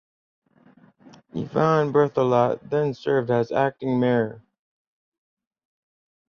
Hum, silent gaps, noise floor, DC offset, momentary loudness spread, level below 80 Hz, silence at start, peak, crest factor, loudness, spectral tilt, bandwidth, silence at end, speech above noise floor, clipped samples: none; none; -55 dBFS; under 0.1%; 7 LU; -64 dBFS; 1.35 s; -6 dBFS; 18 dB; -22 LUFS; -8 dB/octave; 6.8 kHz; 1.9 s; 34 dB; under 0.1%